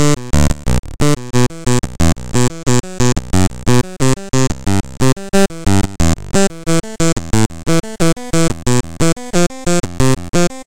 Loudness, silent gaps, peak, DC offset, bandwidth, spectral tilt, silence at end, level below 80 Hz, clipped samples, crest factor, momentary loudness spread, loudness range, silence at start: -16 LUFS; 0.79-0.83 s; 0 dBFS; 10%; 17 kHz; -5 dB/octave; 0 s; -26 dBFS; under 0.1%; 14 dB; 3 LU; 1 LU; 0 s